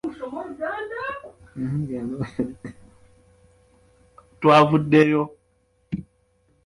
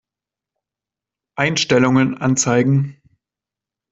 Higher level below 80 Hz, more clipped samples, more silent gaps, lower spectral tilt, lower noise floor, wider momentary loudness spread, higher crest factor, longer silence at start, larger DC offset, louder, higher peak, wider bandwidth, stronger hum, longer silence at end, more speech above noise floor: about the same, -56 dBFS vs -56 dBFS; neither; neither; first, -7.5 dB/octave vs -4.5 dB/octave; second, -65 dBFS vs -88 dBFS; first, 18 LU vs 8 LU; about the same, 22 dB vs 18 dB; second, 0.05 s vs 1.35 s; neither; second, -22 LUFS vs -16 LUFS; about the same, -2 dBFS vs -2 dBFS; first, 11.5 kHz vs 8 kHz; neither; second, 0.65 s vs 1 s; second, 45 dB vs 72 dB